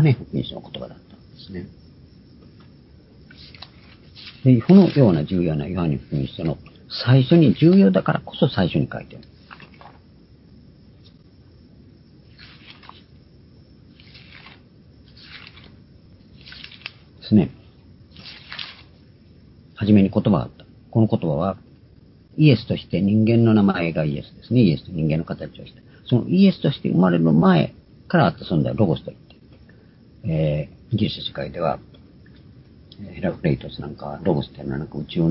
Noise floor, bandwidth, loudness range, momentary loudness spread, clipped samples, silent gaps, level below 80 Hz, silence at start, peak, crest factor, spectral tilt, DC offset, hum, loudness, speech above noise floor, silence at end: -49 dBFS; 5.8 kHz; 10 LU; 24 LU; under 0.1%; none; -46 dBFS; 0 s; 0 dBFS; 20 dB; -12 dB/octave; under 0.1%; none; -20 LUFS; 31 dB; 0 s